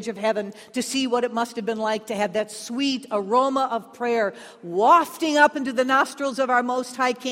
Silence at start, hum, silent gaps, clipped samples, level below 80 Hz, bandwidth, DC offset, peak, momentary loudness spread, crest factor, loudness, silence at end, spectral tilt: 0 s; none; none; under 0.1%; -72 dBFS; 16 kHz; under 0.1%; -4 dBFS; 10 LU; 18 dB; -23 LUFS; 0 s; -3.5 dB/octave